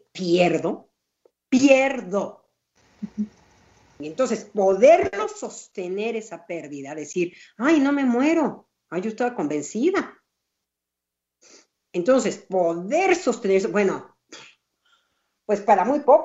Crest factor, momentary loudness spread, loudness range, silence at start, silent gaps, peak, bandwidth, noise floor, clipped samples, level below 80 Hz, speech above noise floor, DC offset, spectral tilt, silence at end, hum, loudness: 22 dB; 17 LU; 4 LU; 0.15 s; none; -2 dBFS; 8.2 kHz; -85 dBFS; under 0.1%; -68 dBFS; 64 dB; under 0.1%; -5 dB/octave; 0 s; none; -22 LUFS